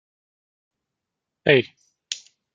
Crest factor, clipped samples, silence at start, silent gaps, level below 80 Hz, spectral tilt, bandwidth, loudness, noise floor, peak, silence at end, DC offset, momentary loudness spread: 26 dB; under 0.1%; 1.45 s; none; -68 dBFS; -4.5 dB/octave; 9.2 kHz; -20 LUFS; -84 dBFS; -2 dBFS; 0.35 s; under 0.1%; 15 LU